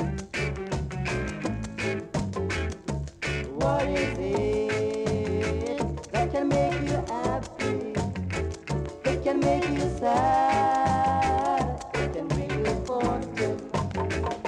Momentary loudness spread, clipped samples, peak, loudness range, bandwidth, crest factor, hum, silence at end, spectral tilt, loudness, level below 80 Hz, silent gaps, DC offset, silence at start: 8 LU; under 0.1%; -12 dBFS; 5 LU; 11.5 kHz; 14 dB; none; 0 s; -6 dB/octave; -27 LUFS; -40 dBFS; none; under 0.1%; 0 s